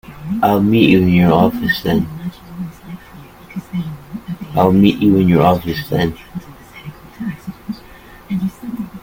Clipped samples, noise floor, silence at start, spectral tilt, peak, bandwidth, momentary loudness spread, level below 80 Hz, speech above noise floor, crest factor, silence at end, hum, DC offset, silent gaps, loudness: under 0.1%; -39 dBFS; 0.1 s; -8 dB/octave; 0 dBFS; 17 kHz; 21 LU; -42 dBFS; 26 dB; 16 dB; 0.05 s; none; under 0.1%; none; -15 LUFS